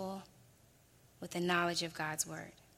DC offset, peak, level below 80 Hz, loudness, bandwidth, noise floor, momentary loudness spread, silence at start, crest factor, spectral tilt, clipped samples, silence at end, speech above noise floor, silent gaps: under 0.1%; -18 dBFS; -72 dBFS; -36 LUFS; 16.5 kHz; -66 dBFS; 16 LU; 0 s; 22 dB; -3 dB/octave; under 0.1%; 0.25 s; 29 dB; none